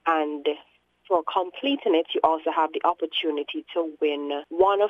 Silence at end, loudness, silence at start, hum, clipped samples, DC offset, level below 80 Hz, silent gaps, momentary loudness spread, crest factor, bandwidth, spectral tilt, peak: 0 s; -25 LUFS; 0.05 s; 60 Hz at -80 dBFS; under 0.1%; under 0.1%; -68 dBFS; none; 7 LU; 20 dB; 7.4 kHz; -5 dB/octave; -6 dBFS